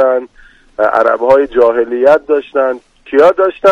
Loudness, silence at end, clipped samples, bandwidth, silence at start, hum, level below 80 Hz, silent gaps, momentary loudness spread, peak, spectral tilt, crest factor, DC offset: -11 LUFS; 0 s; 1%; 7.8 kHz; 0 s; none; -46 dBFS; none; 8 LU; 0 dBFS; -5.5 dB/octave; 10 dB; under 0.1%